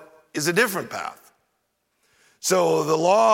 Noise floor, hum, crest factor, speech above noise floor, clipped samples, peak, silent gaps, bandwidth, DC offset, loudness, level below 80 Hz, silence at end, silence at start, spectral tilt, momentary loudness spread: -73 dBFS; none; 18 dB; 53 dB; under 0.1%; -4 dBFS; none; 17 kHz; under 0.1%; -22 LUFS; -74 dBFS; 0 s; 0.35 s; -3.5 dB/octave; 14 LU